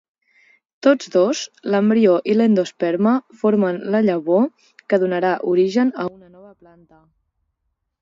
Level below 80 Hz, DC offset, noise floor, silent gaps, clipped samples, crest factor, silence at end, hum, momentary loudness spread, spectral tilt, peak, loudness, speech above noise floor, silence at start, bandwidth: -68 dBFS; under 0.1%; -74 dBFS; none; under 0.1%; 18 dB; 1.9 s; none; 6 LU; -6.5 dB/octave; -2 dBFS; -18 LUFS; 57 dB; 0.85 s; 7.6 kHz